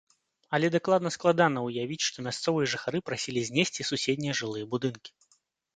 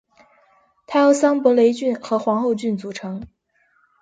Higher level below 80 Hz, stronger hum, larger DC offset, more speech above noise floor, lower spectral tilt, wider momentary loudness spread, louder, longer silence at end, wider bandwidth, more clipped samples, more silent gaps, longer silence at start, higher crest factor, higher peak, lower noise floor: second, -70 dBFS vs -60 dBFS; neither; neither; second, 41 dB vs 45 dB; second, -4 dB/octave vs -5.5 dB/octave; second, 7 LU vs 15 LU; second, -28 LUFS vs -19 LUFS; about the same, 0.7 s vs 0.75 s; about the same, 9.6 kHz vs 9.4 kHz; neither; neither; second, 0.5 s vs 0.9 s; about the same, 20 dB vs 18 dB; second, -8 dBFS vs -4 dBFS; first, -70 dBFS vs -63 dBFS